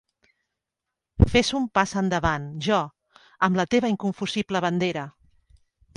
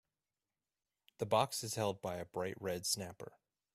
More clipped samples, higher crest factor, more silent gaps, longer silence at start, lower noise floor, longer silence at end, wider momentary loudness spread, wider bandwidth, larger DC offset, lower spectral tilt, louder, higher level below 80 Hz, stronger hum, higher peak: neither; about the same, 24 dB vs 24 dB; neither; about the same, 1.2 s vs 1.2 s; second, -85 dBFS vs under -90 dBFS; first, 0.85 s vs 0.45 s; second, 8 LU vs 14 LU; second, 11 kHz vs 15.5 kHz; neither; first, -5.5 dB/octave vs -3.5 dB/octave; first, -24 LUFS vs -38 LUFS; first, -38 dBFS vs -76 dBFS; neither; first, -2 dBFS vs -18 dBFS